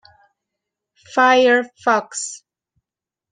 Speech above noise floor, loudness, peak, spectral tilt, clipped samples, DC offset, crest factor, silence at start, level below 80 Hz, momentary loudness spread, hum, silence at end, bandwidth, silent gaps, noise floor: 72 dB; -17 LUFS; -2 dBFS; -2 dB/octave; under 0.1%; under 0.1%; 18 dB; 1.15 s; -72 dBFS; 15 LU; none; 0.95 s; 10 kHz; none; -88 dBFS